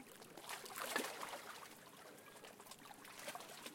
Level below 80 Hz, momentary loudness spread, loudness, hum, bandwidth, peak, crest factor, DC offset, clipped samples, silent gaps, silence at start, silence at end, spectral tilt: -86 dBFS; 15 LU; -50 LUFS; none; 16.5 kHz; -26 dBFS; 26 dB; under 0.1%; under 0.1%; none; 0 s; 0 s; -1.5 dB/octave